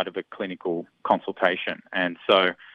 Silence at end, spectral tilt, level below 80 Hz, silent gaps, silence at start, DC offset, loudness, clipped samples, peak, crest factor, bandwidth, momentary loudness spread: 0.2 s; -6.5 dB/octave; -74 dBFS; none; 0 s; under 0.1%; -25 LUFS; under 0.1%; -4 dBFS; 22 dB; 6.8 kHz; 11 LU